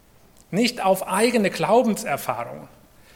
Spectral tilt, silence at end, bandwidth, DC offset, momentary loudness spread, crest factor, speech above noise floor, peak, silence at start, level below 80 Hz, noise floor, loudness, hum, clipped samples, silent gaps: -4.5 dB/octave; 0.5 s; 17.5 kHz; under 0.1%; 11 LU; 18 dB; 31 dB; -6 dBFS; 0.5 s; -60 dBFS; -53 dBFS; -22 LUFS; none; under 0.1%; none